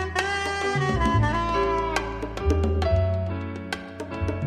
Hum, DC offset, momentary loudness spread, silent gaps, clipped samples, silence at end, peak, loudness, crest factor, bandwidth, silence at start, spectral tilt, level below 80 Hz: none; under 0.1%; 10 LU; none; under 0.1%; 0 s; -6 dBFS; -25 LUFS; 18 dB; 12 kHz; 0 s; -6 dB/octave; -32 dBFS